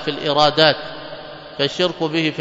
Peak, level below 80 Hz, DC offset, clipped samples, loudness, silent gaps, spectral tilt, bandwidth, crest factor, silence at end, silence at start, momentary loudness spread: 0 dBFS; -54 dBFS; under 0.1%; under 0.1%; -17 LUFS; none; -4.5 dB/octave; 8 kHz; 20 dB; 0 s; 0 s; 20 LU